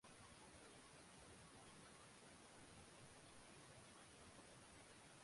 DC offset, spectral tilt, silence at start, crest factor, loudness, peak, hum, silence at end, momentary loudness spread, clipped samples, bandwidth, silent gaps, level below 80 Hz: under 0.1%; -3 dB/octave; 0.05 s; 14 dB; -63 LUFS; -50 dBFS; none; 0 s; 1 LU; under 0.1%; 11.5 kHz; none; -78 dBFS